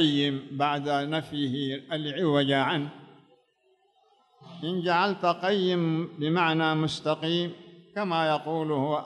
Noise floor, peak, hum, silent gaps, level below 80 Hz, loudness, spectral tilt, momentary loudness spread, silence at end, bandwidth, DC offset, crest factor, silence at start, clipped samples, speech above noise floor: -68 dBFS; -10 dBFS; none; none; -72 dBFS; -27 LUFS; -6.5 dB/octave; 8 LU; 0 s; 11 kHz; under 0.1%; 16 dB; 0 s; under 0.1%; 41 dB